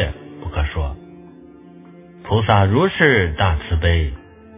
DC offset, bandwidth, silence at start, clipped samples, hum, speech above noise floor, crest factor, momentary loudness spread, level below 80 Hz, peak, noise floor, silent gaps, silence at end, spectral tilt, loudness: under 0.1%; 3.8 kHz; 0 s; under 0.1%; none; 26 dB; 20 dB; 17 LU; -26 dBFS; 0 dBFS; -42 dBFS; none; 0 s; -10 dB/octave; -18 LUFS